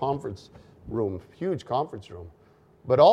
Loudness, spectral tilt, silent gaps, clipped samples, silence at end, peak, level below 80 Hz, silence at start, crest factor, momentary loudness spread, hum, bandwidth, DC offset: -28 LUFS; -7.5 dB/octave; none; under 0.1%; 0 s; -6 dBFS; -56 dBFS; 0 s; 20 dB; 19 LU; none; 9.4 kHz; under 0.1%